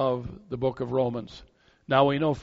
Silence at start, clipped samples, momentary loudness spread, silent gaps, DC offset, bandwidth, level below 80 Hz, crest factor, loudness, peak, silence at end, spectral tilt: 0 s; under 0.1%; 15 LU; none; under 0.1%; 7.6 kHz; -54 dBFS; 20 dB; -27 LUFS; -6 dBFS; 0 s; -5.5 dB/octave